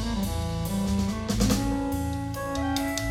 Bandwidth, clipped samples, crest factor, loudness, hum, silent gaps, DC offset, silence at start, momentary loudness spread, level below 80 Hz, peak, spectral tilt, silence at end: 17 kHz; under 0.1%; 18 dB; -28 LUFS; none; none; under 0.1%; 0 s; 6 LU; -36 dBFS; -10 dBFS; -5 dB/octave; 0 s